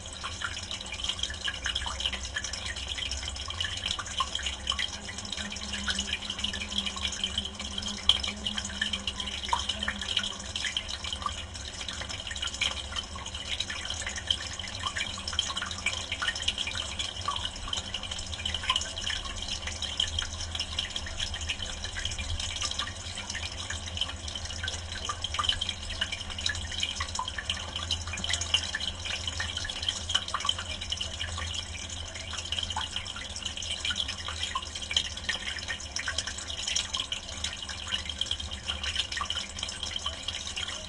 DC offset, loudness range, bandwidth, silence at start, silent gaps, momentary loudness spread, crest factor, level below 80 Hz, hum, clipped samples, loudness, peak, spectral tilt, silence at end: under 0.1%; 3 LU; 11.5 kHz; 0 s; none; 6 LU; 30 dB; -44 dBFS; none; under 0.1%; -31 LUFS; -4 dBFS; -1.5 dB/octave; 0 s